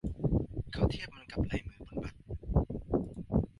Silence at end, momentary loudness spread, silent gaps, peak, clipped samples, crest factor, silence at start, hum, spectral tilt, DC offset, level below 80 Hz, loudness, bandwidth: 0.15 s; 9 LU; none; -14 dBFS; under 0.1%; 20 dB; 0.05 s; none; -8.5 dB/octave; under 0.1%; -40 dBFS; -36 LUFS; 11.5 kHz